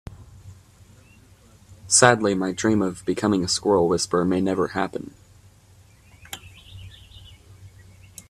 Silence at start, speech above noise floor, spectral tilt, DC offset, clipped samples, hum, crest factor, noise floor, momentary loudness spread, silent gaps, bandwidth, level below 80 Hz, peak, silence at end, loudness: 0.1 s; 32 dB; -3.5 dB/octave; under 0.1%; under 0.1%; none; 24 dB; -53 dBFS; 27 LU; none; 14.5 kHz; -54 dBFS; 0 dBFS; 0.6 s; -21 LUFS